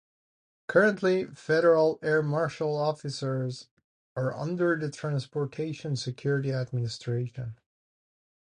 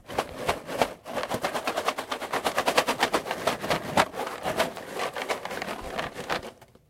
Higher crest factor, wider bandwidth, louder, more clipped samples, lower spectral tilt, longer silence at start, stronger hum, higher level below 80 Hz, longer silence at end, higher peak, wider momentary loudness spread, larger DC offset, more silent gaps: second, 20 dB vs 26 dB; second, 10 kHz vs 17 kHz; about the same, -28 LUFS vs -29 LUFS; neither; first, -6.5 dB/octave vs -3 dB/octave; first, 0.7 s vs 0.05 s; neither; second, -68 dBFS vs -54 dBFS; first, 0.95 s vs 0.25 s; second, -10 dBFS vs -4 dBFS; about the same, 11 LU vs 9 LU; neither; first, 3.71-3.77 s, 3.84-4.16 s vs none